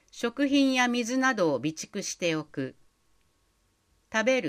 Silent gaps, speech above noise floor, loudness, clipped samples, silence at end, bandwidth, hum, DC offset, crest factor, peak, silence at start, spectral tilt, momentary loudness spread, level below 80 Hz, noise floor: none; 43 dB; -27 LUFS; under 0.1%; 0 s; 15 kHz; none; under 0.1%; 18 dB; -10 dBFS; 0.15 s; -3.5 dB/octave; 11 LU; -68 dBFS; -70 dBFS